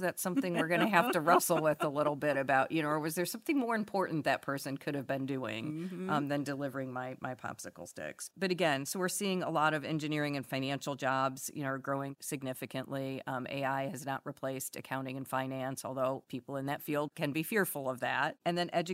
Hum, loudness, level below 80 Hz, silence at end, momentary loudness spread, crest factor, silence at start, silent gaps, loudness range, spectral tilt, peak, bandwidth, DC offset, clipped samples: none; -34 LUFS; -78 dBFS; 0 s; 10 LU; 24 dB; 0 s; none; 7 LU; -4.5 dB/octave; -10 dBFS; 16 kHz; under 0.1%; under 0.1%